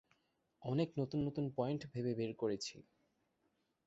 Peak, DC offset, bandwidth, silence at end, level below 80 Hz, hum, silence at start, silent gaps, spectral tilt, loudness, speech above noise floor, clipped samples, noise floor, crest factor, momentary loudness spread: -24 dBFS; under 0.1%; 8 kHz; 1.05 s; -72 dBFS; none; 0.6 s; none; -7 dB/octave; -40 LUFS; 42 dB; under 0.1%; -82 dBFS; 18 dB; 5 LU